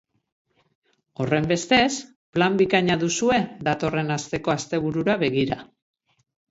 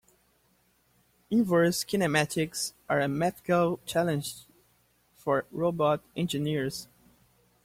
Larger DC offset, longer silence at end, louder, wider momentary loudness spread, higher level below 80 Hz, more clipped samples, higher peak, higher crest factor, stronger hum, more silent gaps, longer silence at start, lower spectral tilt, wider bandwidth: neither; about the same, 0.85 s vs 0.8 s; first, -23 LUFS vs -28 LUFS; about the same, 9 LU vs 9 LU; first, -54 dBFS vs -64 dBFS; neither; first, -4 dBFS vs -12 dBFS; about the same, 20 dB vs 18 dB; neither; first, 2.16-2.33 s vs none; about the same, 1.2 s vs 1.3 s; about the same, -4.5 dB/octave vs -5 dB/octave; second, 8 kHz vs 16.5 kHz